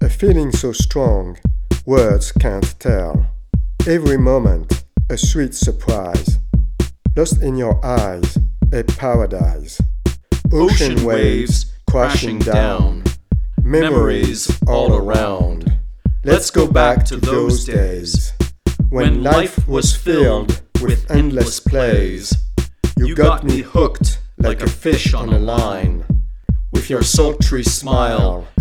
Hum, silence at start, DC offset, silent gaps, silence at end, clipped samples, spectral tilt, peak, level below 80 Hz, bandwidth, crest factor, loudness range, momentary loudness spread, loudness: none; 0 s; 0.6%; none; 0 s; under 0.1%; -5.5 dB/octave; 0 dBFS; -18 dBFS; 15.5 kHz; 14 dB; 2 LU; 7 LU; -16 LUFS